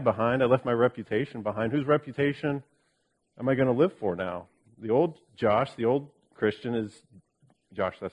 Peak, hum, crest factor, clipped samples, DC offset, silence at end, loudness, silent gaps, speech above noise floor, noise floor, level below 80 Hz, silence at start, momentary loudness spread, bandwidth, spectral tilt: -8 dBFS; none; 20 dB; under 0.1%; under 0.1%; 0.05 s; -28 LUFS; none; 47 dB; -74 dBFS; -64 dBFS; 0 s; 9 LU; 10.5 kHz; -8.5 dB/octave